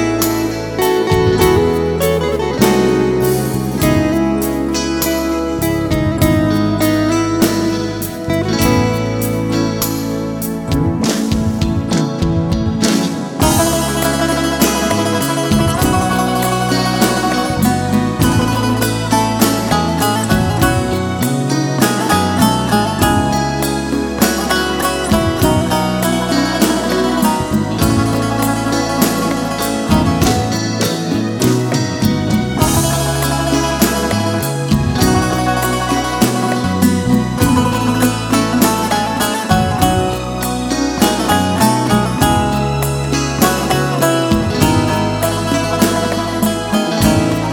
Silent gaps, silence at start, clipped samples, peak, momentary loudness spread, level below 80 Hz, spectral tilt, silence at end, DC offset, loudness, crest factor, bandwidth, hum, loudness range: none; 0 s; under 0.1%; 0 dBFS; 4 LU; -30 dBFS; -5 dB/octave; 0 s; under 0.1%; -15 LUFS; 14 dB; 18 kHz; none; 1 LU